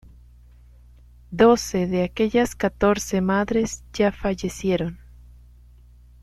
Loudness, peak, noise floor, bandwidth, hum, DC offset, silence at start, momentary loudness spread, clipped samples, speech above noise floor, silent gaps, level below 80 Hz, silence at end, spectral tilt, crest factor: -22 LUFS; -2 dBFS; -49 dBFS; 14 kHz; 60 Hz at -45 dBFS; under 0.1%; 1.3 s; 9 LU; under 0.1%; 28 dB; none; -44 dBFS; 1.25 s; -5.5 dB/octave; 20 dB